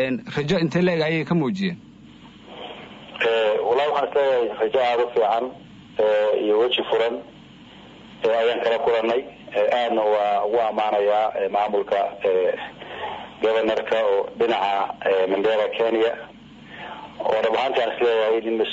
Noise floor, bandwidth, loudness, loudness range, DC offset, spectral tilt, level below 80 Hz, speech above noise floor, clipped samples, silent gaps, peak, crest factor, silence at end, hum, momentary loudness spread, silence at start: -45 dBFS; 7.8 kHz; -22 LUFS; 2 LU; under 0.1%; -6.5 dB/octave; -60 dBFS; 24 dB; under 0.1%; none; -10 dBFS; 12 dB; 0 s; none; 13 LU; 0 s